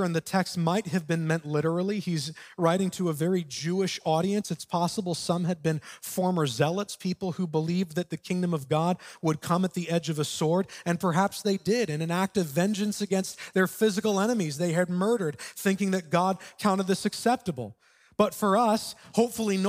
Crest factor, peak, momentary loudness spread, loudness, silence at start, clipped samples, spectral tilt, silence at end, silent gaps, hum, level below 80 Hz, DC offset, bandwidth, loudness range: 20 dB; -8 dBFS; 5 LU; -28 LUFS; 0 s; under 0.1%; -5.5 dB/octave; 0 s; none; none; -68 dBFS; under 0.1%; 16 kHz; 2 LU